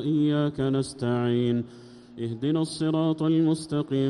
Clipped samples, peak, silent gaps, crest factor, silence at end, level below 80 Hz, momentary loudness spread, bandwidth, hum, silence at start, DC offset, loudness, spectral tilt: under 0.1%; -14 dBFS; none; 12 dB; 0 s; -60 dBFS; 9 LU; 11.5 kHz; none; 0 s; under 0.1%; -26 LUFS; -7 dB/octave